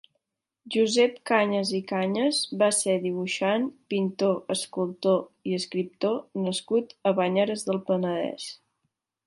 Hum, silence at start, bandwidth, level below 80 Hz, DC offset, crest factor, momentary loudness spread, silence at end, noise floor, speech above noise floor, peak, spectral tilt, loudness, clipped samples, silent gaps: none; 0.65 s; 11.5 kHz; -76 dBFS; under 0.1%; 18 dB; 8 LU; 0.7 s; -79 dBFS; 53 dB; -8 dBFS; -4 dB/octave; -26 LUFS; under 0.1%; none